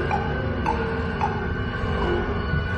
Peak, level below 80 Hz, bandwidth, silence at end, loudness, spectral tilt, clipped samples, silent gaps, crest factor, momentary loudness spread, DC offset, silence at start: -12 dBFS; -32 dBFS; 8.4 kHz; 0 s; -25 LUFS; -7.5 dB/octave; under 0.1%; none; 14 dB; 3 LU; under 0.1%; 0 s